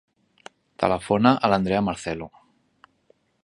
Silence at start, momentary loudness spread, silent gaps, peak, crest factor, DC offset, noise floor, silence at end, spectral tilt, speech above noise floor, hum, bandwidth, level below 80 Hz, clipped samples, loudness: 0.8 s; 14 LU; none; -2 dBFS; 24 dB; under 0.1%; -63 dBFS; 1.2 s; -6.5 dB/octave; 42 dB; none; 11 kHz; -52 dBFS; under 0.1%; -22 LUFS